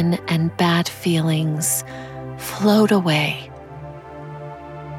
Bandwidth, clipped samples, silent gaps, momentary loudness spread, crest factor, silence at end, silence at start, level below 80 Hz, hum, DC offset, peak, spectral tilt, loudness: 16.5 kHz; under 0.1%; none; 20 LU; 16 dB; 0 s; 0 s; -52 dBFS; none; under 0.1%; -4 dBFS; -5 dB/octave; -19 LUFS